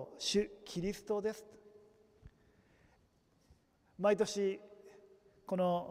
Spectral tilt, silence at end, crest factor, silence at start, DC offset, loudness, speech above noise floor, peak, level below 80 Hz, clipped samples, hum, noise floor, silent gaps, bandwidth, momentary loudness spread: -4.5 dB/octave; 0 s; 20 dB; 0 s; under 0.1%; -36 LUFS; 36 dB; -18 dBFS; -66 dBFS; under 0.1%; none; -72 dBFS; none; 15.5 kHz; 19 LU